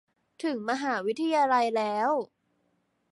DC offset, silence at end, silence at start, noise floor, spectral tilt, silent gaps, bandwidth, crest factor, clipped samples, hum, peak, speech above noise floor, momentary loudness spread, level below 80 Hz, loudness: under 0.1%; 0.85 s; 0.4 s; -73 dBFS; -4.5 dB/octave; none; 11.5 kHz; 16 dB; under 0.1%; none; -12 dBFS; 47 dB; 9 LU; -82 dBFS; -28 LUFS